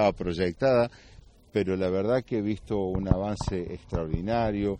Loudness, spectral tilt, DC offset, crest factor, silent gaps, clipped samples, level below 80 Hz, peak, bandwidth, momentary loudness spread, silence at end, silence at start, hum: -28 LUFS; -7.5 dB/octave; under 0.1%; 20 dB; none; under 0.1%; -42 dBFS; -8 dBFS; 10 kHz; 8 LU; 0 s; 0 s; none